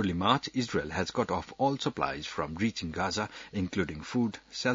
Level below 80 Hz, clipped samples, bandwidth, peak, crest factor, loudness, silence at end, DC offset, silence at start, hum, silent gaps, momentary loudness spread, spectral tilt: -58 dBFS; under 0.1%; 7.8 kHz; -10 dBFS; 22 dB; -32 LUFS; 0 s; under 0.1%; 0 s; none; none; 7 LU; -5 dB/octave